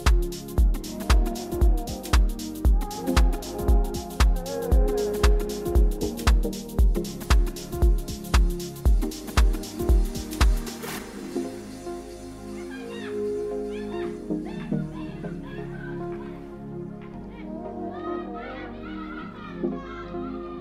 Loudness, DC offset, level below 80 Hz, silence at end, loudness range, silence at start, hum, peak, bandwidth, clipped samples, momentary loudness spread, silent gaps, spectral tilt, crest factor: -27 LUFS; under 0.1%; -26 dBFS; 0 s; 10 LU; 0 s; none; -8 dBFS; 15.5 kHz; under 0.1%; 12 LU; none; -6 dB/octave; 18 dB